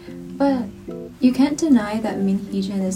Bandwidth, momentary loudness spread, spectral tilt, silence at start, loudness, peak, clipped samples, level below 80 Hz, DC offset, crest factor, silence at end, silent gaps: 14.5 kHz; 15 LU; -6 dB/octave; 0 s; -20 LUFS; -6 dBFS; under 0.1%; -50 dBFS; under 0.1%; 16 dB; 0 s; none